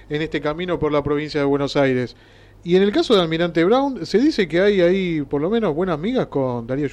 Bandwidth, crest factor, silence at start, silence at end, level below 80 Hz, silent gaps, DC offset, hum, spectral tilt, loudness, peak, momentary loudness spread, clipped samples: 10.5 kHz; 12 dB; 0.1 s; 0 s; -46 dBFS; none; under 0.1%; none; -6.5 dB/octave; -19 LUFS; -6 dBFS; 7 LU; under 0.1%